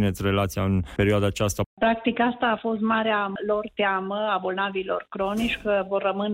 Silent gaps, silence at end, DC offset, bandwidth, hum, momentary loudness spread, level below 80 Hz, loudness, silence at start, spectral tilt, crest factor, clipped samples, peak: 1.66-1.77 s; 0 s; under 0.1%; 16 kHz; none; 4 LU; -46 dBFS; -25 LUFS; 0 s; -5.5 dB/octave; 12 dB; under 0.1%; -12 dBFS